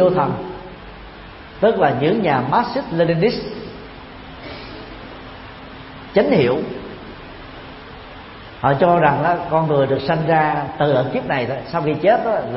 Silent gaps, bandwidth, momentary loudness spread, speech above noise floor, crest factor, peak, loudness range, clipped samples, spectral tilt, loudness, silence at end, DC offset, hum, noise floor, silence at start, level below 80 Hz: none; 5.8 kHz; 21 LU; 20 dB; 20 dB; 0 dBFS; 6 LU; under 0.1%; -11 dB/octave; -18 LUFS; 0 s; under 0.1%; none; -37 dBFS; 0 s; -46 dBFS